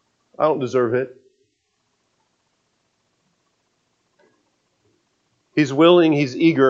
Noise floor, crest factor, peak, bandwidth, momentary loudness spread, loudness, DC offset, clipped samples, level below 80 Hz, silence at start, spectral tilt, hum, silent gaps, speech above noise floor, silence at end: -70 dBFS; 20 dB; 0 dBFS; 7.6 kHz; 12 LU; -18 LUFS; under 0.1%; under 0.1%; -74 dBFS; 0.4 s; -6.5 dB/octave; none; none; 54 dB; 0 s